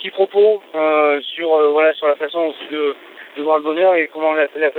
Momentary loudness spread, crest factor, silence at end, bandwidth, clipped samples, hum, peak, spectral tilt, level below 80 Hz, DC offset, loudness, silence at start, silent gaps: 8 LU; 14 dB; 0 s; 4.3 kHz; under 0.1%; none; -2 dBFS; -5.5 dB/octave; -80 dBFS; under 0.1%; -16 LUFS; 0 s; none